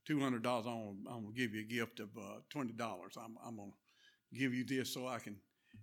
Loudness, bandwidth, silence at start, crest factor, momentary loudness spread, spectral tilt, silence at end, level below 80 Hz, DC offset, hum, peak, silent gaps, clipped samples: -42 LUFS; 18 kHz; 0.05 s; 20 dB; 14 LU; -5 dB/octave; 0 s; -88 dBFS; under 0.1%; none; -22 dBFS; none; under 0.1%